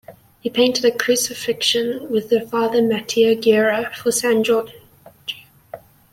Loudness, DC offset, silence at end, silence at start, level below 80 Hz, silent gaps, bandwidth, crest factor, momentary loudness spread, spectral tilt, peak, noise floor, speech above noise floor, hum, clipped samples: -18 LUFS; under 0.1%; 0.35 s; 0.1 s; -62 dBFS; none; 16.5 kHz; 16 dB; 15 LU; -3 dB/octave; -2 dBFS; -40 dBFS; 22 dB; none; under 0.1%